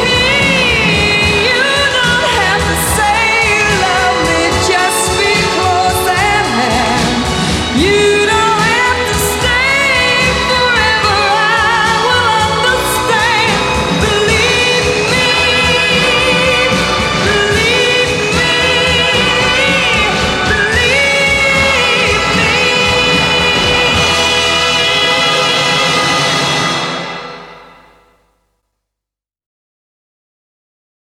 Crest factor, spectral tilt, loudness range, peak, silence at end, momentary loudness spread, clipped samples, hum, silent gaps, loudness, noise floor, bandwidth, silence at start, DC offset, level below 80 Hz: 10 dB; -3 dB/octave; 2 LU; -2 dBFS; 3.5 s; 3 LU; under 0.1%; none; none; -10 LUFS; -84 dBFS; 16.5 kHz; 0 s; under 0.1%; -30 dBFS